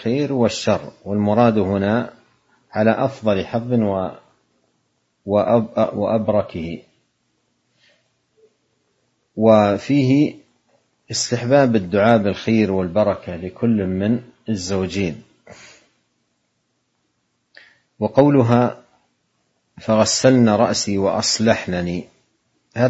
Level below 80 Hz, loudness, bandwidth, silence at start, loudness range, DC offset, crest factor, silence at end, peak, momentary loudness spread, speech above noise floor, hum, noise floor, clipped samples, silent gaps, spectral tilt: -54 dBFS; -18 LUFS; 8.2 kHz; 0 s; 9 LU; under 0.1%; 20 dB; 0 s; 0 dBFS; 13 LU; 52 dB; none; -70 dBFS; under 0.1%; none; -5.5 dB/octave